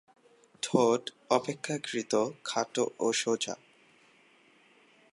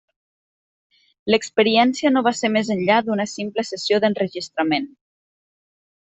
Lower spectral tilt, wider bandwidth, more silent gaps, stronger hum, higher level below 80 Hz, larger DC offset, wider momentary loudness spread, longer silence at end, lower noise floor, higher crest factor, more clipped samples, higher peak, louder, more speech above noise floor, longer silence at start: about the same, -3.5 dB/octave vs -4.5 dB/octave; first, 11.5 kHz vs 8.4 kHz; neither; neither; second, -82 dBFS vs -64 dBFS; neither; about the same, 8 LU vs 8 LU; first, 1.6 s vs 1.2 s; second, -63 dBFS vs under -90 dBFS; about the same, 22 dB vs 20 dB; neither; second, -10 dBFS vs -2 dBFS; second, -30 LUFS vs -20 LUFS; second, 33 dB vs over 70 dB; second, 0.65 s vs 1.25 s